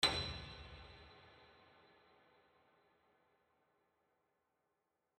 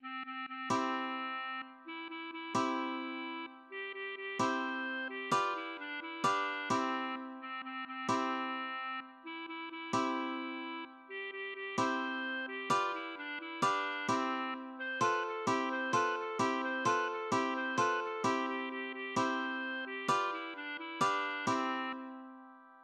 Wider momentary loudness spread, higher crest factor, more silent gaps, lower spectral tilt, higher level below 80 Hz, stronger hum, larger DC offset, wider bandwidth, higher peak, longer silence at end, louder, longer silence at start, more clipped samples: first, 25 LU vs 10 LU; first, 30 dB vs 18 dB; neither; about the same, -2.5 dB/octave vs -3.5 dB/octave; first, -64 dBFS vs -84 dBFS; neither; neither; about the same, 11.5 kHz vs 12 kHz; about the same, -18 dBFS vs -18 dBFS; first, 3.65 s vs 0 s; second, -43 LUFS vs -36 LUFS; about the same, 0 s vs 0 s; neither